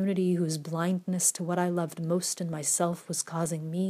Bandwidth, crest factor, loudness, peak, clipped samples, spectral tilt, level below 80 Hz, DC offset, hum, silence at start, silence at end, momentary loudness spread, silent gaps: 15.5 kHz; 18 dB; -29 LUFS; -12 dBFS; under 0.1%; -4.5 dB/octave; -76 dBFS; under 0.1%; none; 0 s; 0 s; 6 LU; none